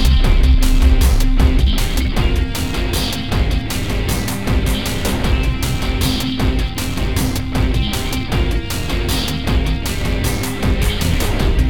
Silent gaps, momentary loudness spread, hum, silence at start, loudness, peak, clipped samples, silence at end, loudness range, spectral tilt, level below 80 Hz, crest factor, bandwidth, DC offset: none; 5 LU; none; 0 s; -18 LUFS; 0 dBFS; under 0.1%; 0 s; 2 LU; -5 dB/octave; -16 dBFS; 14 dB; 18 kHz; 3%